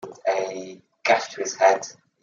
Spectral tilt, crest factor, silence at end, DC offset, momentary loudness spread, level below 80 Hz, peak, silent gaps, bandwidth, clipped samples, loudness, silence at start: -2 dB/octave; 20 dB; 0.3 s; under 0.1%; 17 LU; -80 dBFS; -4 dBFS; none; 7.6 kHz; under 0.1%; -23 LUFS; 0.05 s